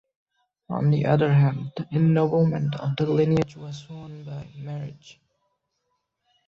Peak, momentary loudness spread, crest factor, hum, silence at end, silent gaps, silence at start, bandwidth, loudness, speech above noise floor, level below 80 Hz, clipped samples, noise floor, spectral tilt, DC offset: -8 dBFS; 18 LU; 16 dB; none; 1.35 s; none; 0.7 s; 7 kHz; -23 LUFS; 53 dB; -58 dBFS; under 0.1%; -76 dBFS; -9 dB/octave; under 0.1%